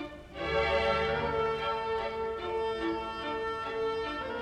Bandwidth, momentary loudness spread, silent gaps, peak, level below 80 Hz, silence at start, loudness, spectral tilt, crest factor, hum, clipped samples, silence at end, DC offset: 9.6 kHz; 7 LU; none; -16 dBFS; -50 dBFS; 0 s; -32 LUFS; -5.5 dB/octave; 16 dB; none; under 0.1%; 0 s; under 0.1%